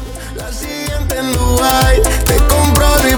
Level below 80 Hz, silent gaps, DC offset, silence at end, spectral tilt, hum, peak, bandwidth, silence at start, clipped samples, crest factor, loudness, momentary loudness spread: -16 dBFS; none; under 0.1%; 0 s; -4 dB/octave; none; 0 dBFS; 20 kHz; 0 s; under 0.1%; 12 dB; -13 LUFS; 13 LU